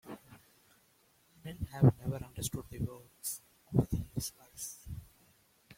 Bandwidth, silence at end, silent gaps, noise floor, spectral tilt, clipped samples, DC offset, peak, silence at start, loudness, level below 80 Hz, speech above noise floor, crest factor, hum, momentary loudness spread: 16.5 kHz; 0.05 s; none; -69 dBFS; -6 dB/octave; under 0.1%; under 0.1%; -12 dBFS; 0.05 s; -36 LUFS; -54 dBFS; 37 dB; 24 dB; none; 21 LU